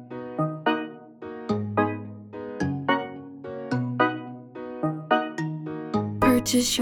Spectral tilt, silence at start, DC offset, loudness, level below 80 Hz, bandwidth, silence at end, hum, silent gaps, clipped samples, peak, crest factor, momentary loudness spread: -4.5 dB/octave; 0 s; under 0.1%; -26 LUFS; -54 dBFS; 20 kHz; 0 s; none; none; under 0.1%; -6 dBFS; 20 dB; 17 LU